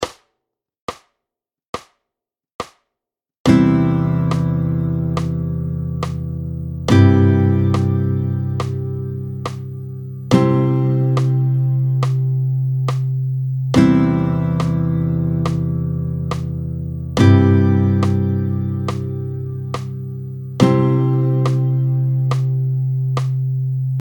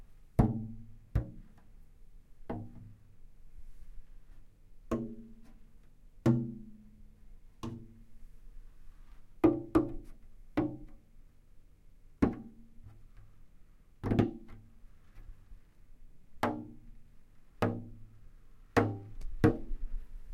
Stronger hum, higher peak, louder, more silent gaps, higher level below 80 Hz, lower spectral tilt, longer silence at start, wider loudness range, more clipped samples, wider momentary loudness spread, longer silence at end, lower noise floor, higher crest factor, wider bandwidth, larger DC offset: neither; first, 0 dBFS vs -10 dBFS; first, -18 LUFS vs -34 LUFS; first, 0.81-0.88 s, 1.68-1.73 s, 2.54-2.59 s, 3.38-3.45 s vs none; first, -40 dBFS vs -48 dBFS; about the same, -8.5 dB/octave vs -8.5 dB/octave; about the same, 0 s vs 0 s; second, 3 LU vs 10 LU; neither; second, 14 LU vs 27 LU; about the same, 0 s vs 0 s; first, -85 dBFS vs -56 dBFS; second, 18 dB vs 28 dB; first, 18 kHz vs 15.5 kHz; neither